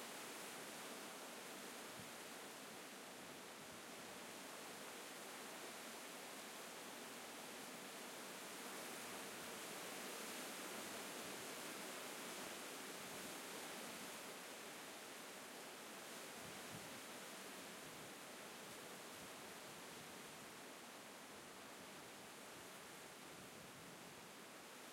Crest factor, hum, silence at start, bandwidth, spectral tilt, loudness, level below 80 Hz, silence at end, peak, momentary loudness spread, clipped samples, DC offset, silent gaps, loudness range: 16 dB; none; 0 s; 16.5 kHz; -1.5 dB/octave; -52 LUFS; -90 dBFS; 0 s; -38 dBFS; 6 LU; under 0.1%; under 0.1%; none; 6 LU